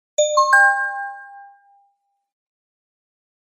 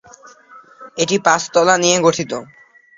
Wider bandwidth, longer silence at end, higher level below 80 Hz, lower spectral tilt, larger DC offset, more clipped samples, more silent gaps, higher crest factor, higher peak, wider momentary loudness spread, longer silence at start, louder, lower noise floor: first, 14.5 kHz vs 7.8 kHz; first, 2.05 s vs 0.55 s; second, under -90 dBFS vs -58 dBFS; second, 5.5 dB/octave vs -3 dB/octave; neither; neither; neither; about the same, 20 dB vs 18 dB; about the same, -2 dBFS vs 0 dBFS; first, 19 LU vs 14 LU; second, 0.2 s vs 0.55 s; about the same, -15 LUFS vs -15 LUFS; first, -67 dBFS vs -44 dBFS